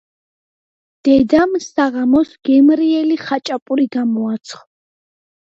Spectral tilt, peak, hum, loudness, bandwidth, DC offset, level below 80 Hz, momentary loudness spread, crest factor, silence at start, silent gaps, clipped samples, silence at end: -5.5 dB/octave; 0 dBFS; none; -15 LUFS; 7.8 kHz; under 0.1%; -52 dBFS; 9 LU; 16 dB; 1.05 s; 3.62-3.66 s; under 0.1%; 1 s